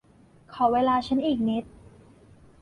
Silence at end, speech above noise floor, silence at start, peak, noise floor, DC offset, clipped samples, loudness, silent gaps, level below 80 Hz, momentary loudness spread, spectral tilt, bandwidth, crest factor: 1 s; 32 dB; 0.5 s; -10 dBFS; -56 dBFS; under 0.1%; under 0.1%; -25 LUFS; none; -56 dBFS; 9 LU; -7 dB/octave; 10.5 kHz; 18 dB